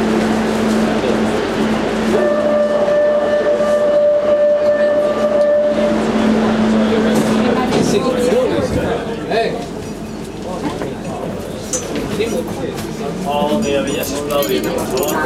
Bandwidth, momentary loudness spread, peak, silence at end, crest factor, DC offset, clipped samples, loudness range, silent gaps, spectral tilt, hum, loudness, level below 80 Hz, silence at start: 16 kHz; 10 LU; -2 dBFS; 0 s; 14 dB; under 0.1%; under 0.1%; 8 LU; none; -5 dB/octave; none; -16 LUFS; -40 dBFS; 0 s